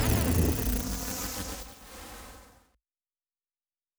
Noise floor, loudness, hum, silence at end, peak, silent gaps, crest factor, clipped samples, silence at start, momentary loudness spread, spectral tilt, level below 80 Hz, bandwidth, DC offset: under -90 dBFS; -30 LUFS; none; 1.55 s; -12 dBFS; none; 20 dB; under 0.1%; 0 s; 19 LU; -4.5 dB/octave; -38 dBFS; over 20 kHz; under 0.1%